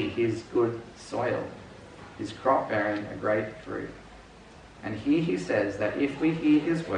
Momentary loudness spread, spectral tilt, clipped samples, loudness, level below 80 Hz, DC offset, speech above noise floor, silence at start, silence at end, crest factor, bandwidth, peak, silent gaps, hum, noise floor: 16 LU; -7 dB/octave; under 0.1%; -28 LUFS; -58 dBFS; under 0.1%; 22 dB; 0 s; 0 s; 18 dB; 10 kHz; -10 dBFS; none; none; -50 dBFS